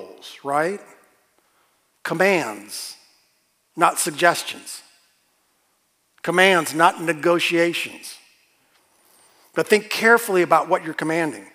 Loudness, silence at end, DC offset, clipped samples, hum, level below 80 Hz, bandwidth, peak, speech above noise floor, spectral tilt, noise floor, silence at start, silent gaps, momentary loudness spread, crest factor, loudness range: -20 LUFS; 0.1 s; under 0.1%; under 0.1%; none; -82 dBFS; 16 kHz; 0 dBFS; 47 dB; -3.5 dB/octave; -67 dBFS; 0 s; none; 19 LU; 22 dB; 5 LU